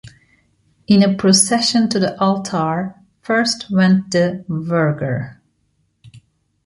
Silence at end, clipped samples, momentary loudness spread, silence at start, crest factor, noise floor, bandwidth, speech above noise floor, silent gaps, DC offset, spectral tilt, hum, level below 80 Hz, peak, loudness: 0.5 s; under 0.1%; 12 LU; 0.05 s; 16 dB; -65 dBFS; 11.5 kHz; 49 dB; none; under 0.1%; -4.5 dB/octave; none; -56 dBFS; -2 dBFS; -16 LUFS